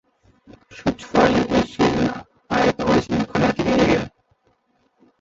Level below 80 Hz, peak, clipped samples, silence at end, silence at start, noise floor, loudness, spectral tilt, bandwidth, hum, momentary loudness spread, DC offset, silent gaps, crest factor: -42 dBFS; -2 dBFS; under 0.1%; 1.15 s; 0.7 s; -65 dBFS; -20 LUFS; -6 dB/octave; 8 kHz; none; 9 LU; under 0.1%; none; 20 dB